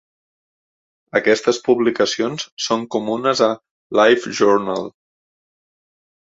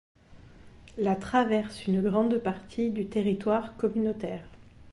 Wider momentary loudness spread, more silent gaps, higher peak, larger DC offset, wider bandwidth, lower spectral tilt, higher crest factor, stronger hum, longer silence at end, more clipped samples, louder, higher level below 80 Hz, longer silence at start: about the same, 10 LU vs 9 LU; first, 2.52-2.57 s, 3.71-3.90 s vs none; first, -2 dBFS vs -12 dBFS; neither; second, 8 kHz vs 11.5 kHz; second, -3.5 dB/octave vs -7.5 dB/octave; about the same, 18 dB vs 16 dB; neither; first, 1.4 s vs 0.05 s; neither; first, -18 LUFS vs -28 LUFS; second, -62 dBFS vs -56 dBFS; first, 1.15 s vs 0.3 s